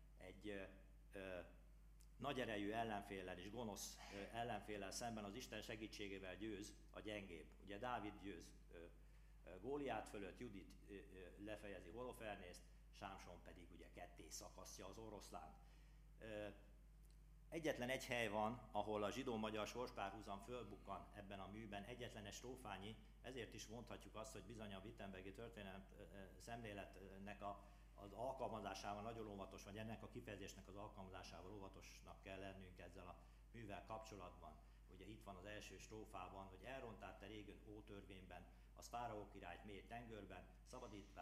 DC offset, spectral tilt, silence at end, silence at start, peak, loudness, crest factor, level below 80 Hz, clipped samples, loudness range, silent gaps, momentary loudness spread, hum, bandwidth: under 0.1%; -4.5 dB/octave; 0 s; 0 s; -30 dBFS; -54 LUFS; 24 dB; -66 dBFS; under 0.1%; 10 LU; none; 15 LU; none; 15.5 kHz